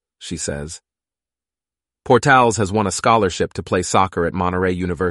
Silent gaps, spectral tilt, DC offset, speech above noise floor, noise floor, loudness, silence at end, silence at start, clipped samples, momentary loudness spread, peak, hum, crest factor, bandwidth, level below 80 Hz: none; -4.5 dB/octave; under 0.1%; over 72 dB; under -90 dBFS; -18 LUFS; 0 s; 0.2 s; under 0.1%; 14 LU; 0 dBFS; none; 18 dB; 11.5 kHz; -44 dBFS